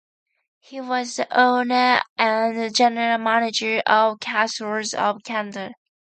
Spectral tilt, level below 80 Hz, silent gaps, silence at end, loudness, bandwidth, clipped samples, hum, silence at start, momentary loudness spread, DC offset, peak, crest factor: -2.5 dB/octave; -76 dBFS; 2.09-2.16 s; 0.4 s; -20 LUFS; 9.2 kHz; under 0.1%; none; 0.7 s; 10 LU; under 0.1%; -4 dBFS; 18 dB